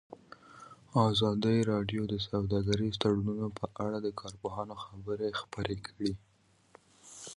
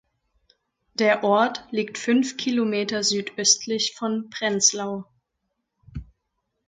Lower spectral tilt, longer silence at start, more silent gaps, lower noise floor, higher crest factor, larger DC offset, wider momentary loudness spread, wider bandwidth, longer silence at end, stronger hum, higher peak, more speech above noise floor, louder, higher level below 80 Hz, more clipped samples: first, -6.5 dB/octave vs -2 dB/octave; second, 0.1 s vs 1 s; neither; second, -62 dBFS vs -78 dBFS; about the same, 22 dB vs 20 dB; neither; first, 22 LU vs 16 LU; about the same, 11.5 kHz vs 11 kHz; second, 0.05 s vs 0.65 s; neither; second, -12 dBFS vs -4 dBFS; second, 30 dB vs 55 dB; second, -33 LUFS vs -22 LUFS; about the same, -56 dBFS vs -54 dBFS; neither